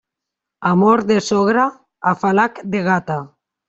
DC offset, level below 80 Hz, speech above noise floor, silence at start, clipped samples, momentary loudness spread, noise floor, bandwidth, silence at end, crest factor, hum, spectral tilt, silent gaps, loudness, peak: under 0.1%; -58 dBFS; 67 dB; 0.6 s; under 0.1%; 9 LU; -83 dBFS; 8 kHz; 0.4 s; 16 dB; none; -6 dB/octave; none; -17 LUFS; -2 dBFS